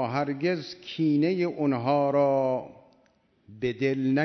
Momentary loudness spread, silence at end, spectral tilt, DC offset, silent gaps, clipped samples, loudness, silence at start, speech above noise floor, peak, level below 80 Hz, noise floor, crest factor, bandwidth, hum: 10 LU; 0 s; -8 dB/octave; under 0.1%; none; under 0.1%; -26 LUFS; 0 s; 39 dB; -12 dBFS; -68 dBFS; -65 dBFS; 14 dB; 6.4 kHz; none